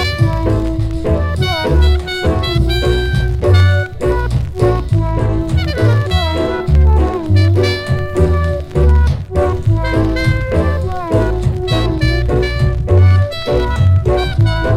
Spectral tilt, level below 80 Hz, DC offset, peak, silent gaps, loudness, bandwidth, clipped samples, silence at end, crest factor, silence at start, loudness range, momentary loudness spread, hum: -7 dB/octave; -18 dBFS; under 0.1%; 0 dBFS; none; -14 LUFS; 12.5 kHz; under 0.1%; 0 s; 12 dB; 0 s; 1 LU; 5 LU; none